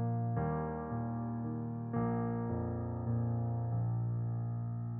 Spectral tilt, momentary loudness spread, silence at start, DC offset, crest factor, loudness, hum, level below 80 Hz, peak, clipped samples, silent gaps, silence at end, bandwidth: -9 dB/octave; 4 LU; 0 s; under 0.1%; 14 dB; -37 LUFS; none; -56 dBFS; -22 dBFS; under 0.1%; none; 0 s; 2.3 kHz